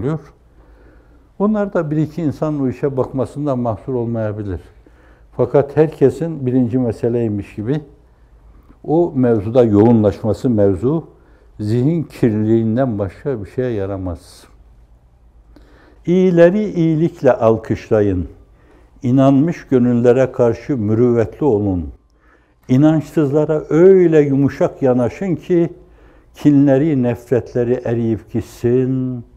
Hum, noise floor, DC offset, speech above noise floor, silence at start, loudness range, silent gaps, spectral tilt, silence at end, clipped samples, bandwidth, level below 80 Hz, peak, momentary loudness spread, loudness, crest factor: none; -52 dBFS; under 0.1%; 37 dB; 0 s; 6 LU; none; -9.5 dB/octave; 0.15 s; under 0.1%; 11.5 kHz; -44 dBFS; 0 dBFS; 11 LU; -16 LUFS; 16 dB